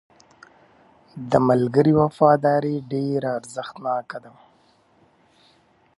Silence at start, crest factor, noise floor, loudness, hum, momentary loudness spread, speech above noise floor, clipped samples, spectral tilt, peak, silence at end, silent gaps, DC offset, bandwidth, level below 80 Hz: 1.15 s; 20 dB; -59 dBFS; -21 LUFS; none; 16 LU; 39 dB; under 0.1%; -8 dB/octave; -2 dBFS; 1.7 s; none; under 0.1%; 11.5 kHz; -58 dBFS